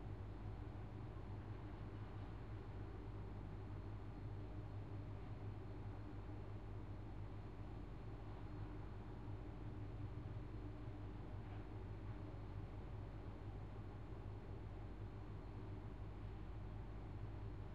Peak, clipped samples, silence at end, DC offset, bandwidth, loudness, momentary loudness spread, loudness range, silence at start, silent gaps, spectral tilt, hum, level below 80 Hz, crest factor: -38 dBFS; under 0.1%; 0 s; 0.1%; 7.2 kHz; -53 LUFS; 2 LU; 1 LU; 0 s; none; -9 dB/octave; none; -56 dBFS; 12 dB